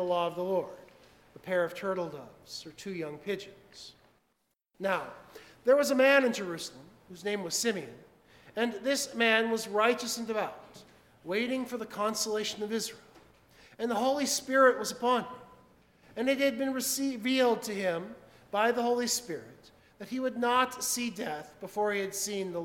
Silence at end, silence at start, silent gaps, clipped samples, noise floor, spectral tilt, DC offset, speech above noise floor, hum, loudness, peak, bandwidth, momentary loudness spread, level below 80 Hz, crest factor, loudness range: 0 s; 0 s; none; under 0.1%; -77 dBFS; -2.5 dB/octave; under 0.1%; 47 dB; none; -30 LUFS; -10 dBFS; 17.5 kHz; 18 LU; -72 dBFS; 22 dB; 8 LU